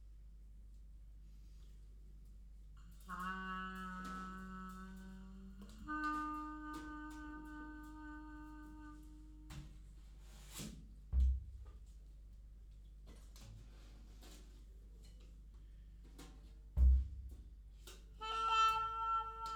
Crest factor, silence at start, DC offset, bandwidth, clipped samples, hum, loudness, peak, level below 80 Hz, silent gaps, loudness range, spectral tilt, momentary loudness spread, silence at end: 22 dB; 0 s; under 0.1%; 15 kHz; under 0.1%; none; -41 LUFS; -22 dBFS; -46 dBFS; none; 20 LU; -5 dB/octave; 23 LU; 0 s